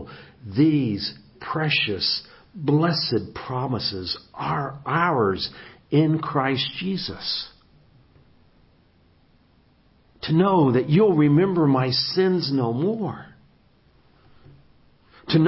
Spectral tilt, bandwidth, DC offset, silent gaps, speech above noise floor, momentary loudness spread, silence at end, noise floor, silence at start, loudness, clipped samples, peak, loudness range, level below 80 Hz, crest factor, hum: -10 dB/octave; 5.8 kHz; under 0.1%; none; 37 dB; 13 LU; 0 s; -59 dBFS; 0 s; -22 LUFS; under 0.1%; -6 dBFS; 9 LU; -54 dBFS; 18 dB; none